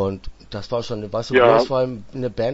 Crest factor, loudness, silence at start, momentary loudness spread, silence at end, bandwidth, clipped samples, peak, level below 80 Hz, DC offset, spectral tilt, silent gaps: 20 dB; -20 LUFS; 0 s; 19 LU; 0 s; 8 kHz; under 0.1%; 0 dBFS; -44 dBFS; under 0.1%; -6 dB/octave; none